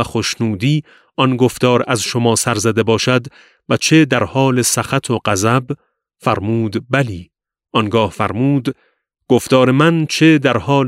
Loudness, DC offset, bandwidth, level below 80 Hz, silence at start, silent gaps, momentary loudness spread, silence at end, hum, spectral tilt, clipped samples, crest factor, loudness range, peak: -15 LUFS; under 0.1%; 16 kHz; -50 dBFS; 0 s; none; 8 LU; 0 s; none; -5 dB/octave; under 0.1%; 16 dB; 4 LU; 0 dBFS